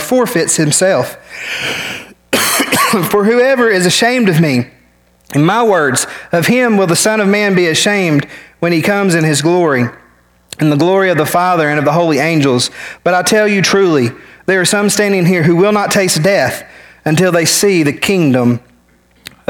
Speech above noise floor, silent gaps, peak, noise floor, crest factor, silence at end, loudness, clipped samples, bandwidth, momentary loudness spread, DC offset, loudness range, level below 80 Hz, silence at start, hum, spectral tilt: 39 dB; none; 0 dBFS; -50 dBFS; 12 dB; 0.2 s; -11 LUFS; under 0.1%; 19.5 kHz; 8 LU; under 0.1%; 2 LU; -52 dBFS; 0 s; none; -4 dB/octave